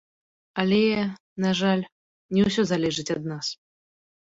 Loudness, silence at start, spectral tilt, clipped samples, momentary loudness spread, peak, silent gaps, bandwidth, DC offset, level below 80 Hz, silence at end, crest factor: -25 LUFS; 0.55 s; -5.5 dB/octave; under 0.1%; 11 LU; -6 dBFS; 1.20-1.36 s, 1.92-2.29 s; 7.8 kHz; under 0.1%; -58 dBFS; 0.75 s; 20 dB